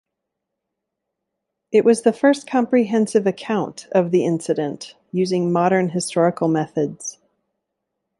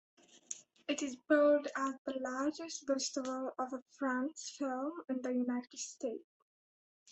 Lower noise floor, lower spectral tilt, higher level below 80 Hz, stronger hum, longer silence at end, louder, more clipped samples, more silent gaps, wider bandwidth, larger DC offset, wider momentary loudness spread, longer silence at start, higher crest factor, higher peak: second, -81 dBFS vs under -90 dBFS; first, -6 dB/octave vs -2 dB/octave; first, -66 dBFS vs -84 dBFS; neither; first, 1.05 s vs 0 s; first, -19 LUFS vs -37 LUFS; neither; second, none vs 1.98-2.05 s, 3.82-3.86 s, 6.24-7.06 s; first, 11.5 kHz vs 8.2 kHz; neither; second, 8 LU vs 13 LU; first, 1.7 s vs 0.35 s; about the same, 18 dB vs 20 dB; first, -4 dBFS vs -18 dBFS